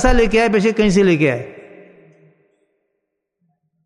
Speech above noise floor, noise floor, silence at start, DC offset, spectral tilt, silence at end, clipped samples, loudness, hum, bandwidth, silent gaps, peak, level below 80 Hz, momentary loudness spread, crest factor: 61 dB; -75 dBFS; 0 s; under 0.1%; -6 dB/octave; 2.25 s; under 0.1%; -15 LUFS; none; 11.5 kHz; none; 0 dBFS; -28 dBFS; 10 LU; 18 dB